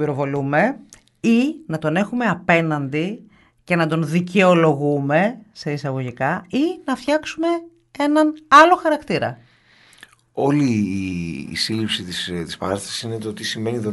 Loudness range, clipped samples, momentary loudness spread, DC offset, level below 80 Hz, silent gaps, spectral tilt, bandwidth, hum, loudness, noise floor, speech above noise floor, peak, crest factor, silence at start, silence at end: 6 LU; under 0.1%; 12 LU; under 0.1%; -56 dBFS; none; -5.5 dB/octave; 11.5 kHz; none; -19 LUFS; -53 dBFS; 34 dB; 0 dBFS; 20 dB; 0 s; 0 s